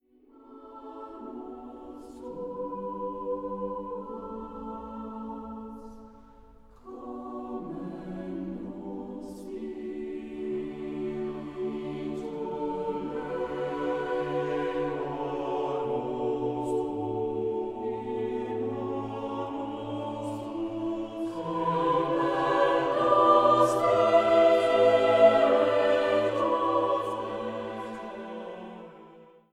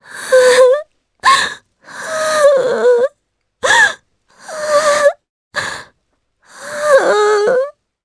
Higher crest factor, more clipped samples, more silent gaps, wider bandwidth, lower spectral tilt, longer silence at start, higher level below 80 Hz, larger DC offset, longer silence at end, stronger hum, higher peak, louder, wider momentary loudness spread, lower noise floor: first, 20 dB vs 14 dB; neither; second, none vs 5.29-5.51 s; first, 12.5 kHz vs 11 kHz; first, -6.5 dB/octave vs -1 dB/octave; first, 0.35 s vs 0.1 s; about the same, -60 dBFS vs -58 dBFS; neither; about the same, 0.3 s vs 0.35 s; neither; second, -8 dBFS vs 0 dBFS; second, -28 LUFS vs -13 LUFS; about the same, 19 LU vs 18 LU; second, -56 dBFS vs -65 dBFS